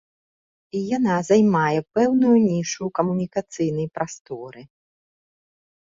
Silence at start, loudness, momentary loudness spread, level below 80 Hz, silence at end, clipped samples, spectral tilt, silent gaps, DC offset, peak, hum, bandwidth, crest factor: 0.75 s; -21 LUFS; 15 LU; -62 dBFS; 1.2 s; under 0.1%; -6.5 dB/octave; 4.20-4.25 s; under 0.1%; -6 dBFS; none; 7.8 kHz; 18 dB